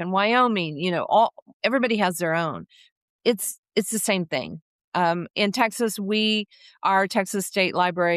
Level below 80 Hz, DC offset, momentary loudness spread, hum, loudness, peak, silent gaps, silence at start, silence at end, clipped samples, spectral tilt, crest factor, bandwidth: -72 dBFS; under 0.1%; 8 LU; none; -23 LUFS; -8 dBFS; 1.42-1.46 s, 1.53-1.60 s, 2.92-3.19 s, 3.58-3.63 s, 4.62-4.92 s; 0 s; 0 s; under 0.1%; -4 dB/octave; 16 dB; 14.5 kHz